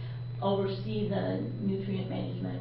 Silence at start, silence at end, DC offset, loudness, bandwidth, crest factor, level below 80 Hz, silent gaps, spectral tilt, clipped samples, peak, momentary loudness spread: 0 s; 0 s; under 0.1%; -33 LUFS; 5.4 kHz; 16 dB; -58 dBFS; none; -11.5 dB/octave; under 0.1%; -16 dBFS; 5 LU